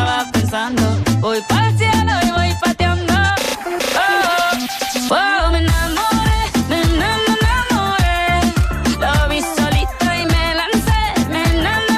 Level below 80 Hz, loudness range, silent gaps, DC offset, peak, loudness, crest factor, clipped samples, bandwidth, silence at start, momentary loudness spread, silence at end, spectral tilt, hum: -24 dBFS; 1 LU; none; under 0.1%; -4 dBFS; -16 LUFS; 12 dB; under 0.1%; 15.5 kHz; 0 s; 3 LU; 0 s; -4.5 dB/octave; none